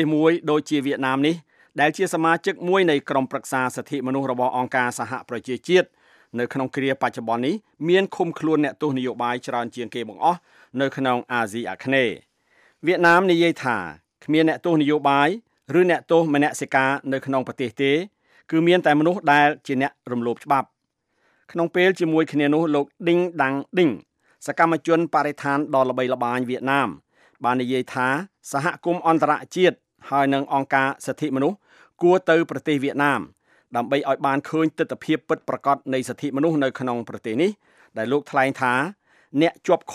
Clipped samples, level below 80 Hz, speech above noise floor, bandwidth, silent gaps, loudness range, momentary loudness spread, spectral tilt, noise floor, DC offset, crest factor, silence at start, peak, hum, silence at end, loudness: under 0.1%; -74 dBFS; 51 dB; 14 kHz; none; 4 LU; 10 LU; -5.5 dB/octave; -72 dBFS; under 0.1%; 18 dB; 0 s; -4 dBFS; none; 0 s; -22 LUFS